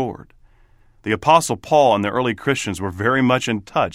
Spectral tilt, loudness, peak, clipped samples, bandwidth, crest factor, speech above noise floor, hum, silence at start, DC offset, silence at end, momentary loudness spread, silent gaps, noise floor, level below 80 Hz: -5 dB/octave; -18 LUFS; 0 dBFS; under 0.1%; 16 kHz; 20 dB; 34 dB; none; 0 s; under 0.1%; 0 s; 10 LU; none; -52 dBFS; -50 dBFS